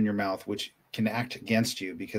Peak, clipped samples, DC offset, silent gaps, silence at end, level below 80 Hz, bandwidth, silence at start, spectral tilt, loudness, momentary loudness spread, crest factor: -12 dBFS; under 0.1%; under 0.1%; none; 0 s; -68 dBFS; 16 kHz; 0 s; -5 dB/octave; -30 LUFS; 8 LU; 18 dB